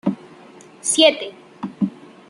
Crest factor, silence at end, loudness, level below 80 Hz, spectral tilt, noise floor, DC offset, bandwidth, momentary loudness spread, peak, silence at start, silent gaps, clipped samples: 20 dB; 0.4 s; -18 LUFS; -70 dBFS; -3 dB/octave; -44 dBFS; under 0.1%; 11.5 kHz; 20 LU; -2 dBFS; 0.05 s; none; under 0.1%